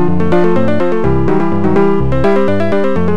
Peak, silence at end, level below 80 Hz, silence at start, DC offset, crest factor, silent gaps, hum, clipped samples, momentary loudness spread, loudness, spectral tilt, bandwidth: 0 dBFS; 0 s; -30 dBFS; 0 s; 20%; 12 dB; none; none; under 0.1%; 2 LU; -13 LUFS; -9 dB/octave; 8.8 kHz